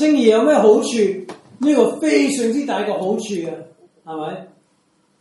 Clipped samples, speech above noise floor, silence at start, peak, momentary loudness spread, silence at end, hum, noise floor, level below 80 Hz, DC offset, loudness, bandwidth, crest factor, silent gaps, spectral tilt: under 0.1%; 45 dB; 0 s; -2 dBFS; 17 LU; 0.75 s; none; -61 dBFS; -70 dBFS; under 0.1%; -17 LUFS; 11.5 kHz; 16 dB; none; -4.5 dB/octave